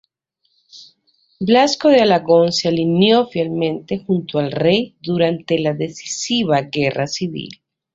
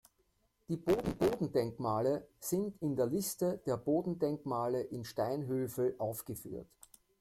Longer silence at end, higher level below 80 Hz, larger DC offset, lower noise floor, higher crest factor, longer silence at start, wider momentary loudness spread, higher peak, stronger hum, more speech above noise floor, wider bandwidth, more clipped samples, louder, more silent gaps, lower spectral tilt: second, 0.4 s vs 0.55 s; about the same, -58 dBFS vs -62 dBFS; neither; second, -68 dBFS vs -76 dBFS; about the same, 16 dB vs 16 dB; about the same, 0.75 s vs 0.7 s; first, 11 LU vs 7 LU; first, -2 dBFS vs -18 dBFS; neither; first, 51 dB vs 41 dB; second, 7.8 kHz vs 16.5 kHz; neither; first, -17 LUFS vs -36 LUFS; neither; about the same, -5 dB/octave vs -6 dB/octave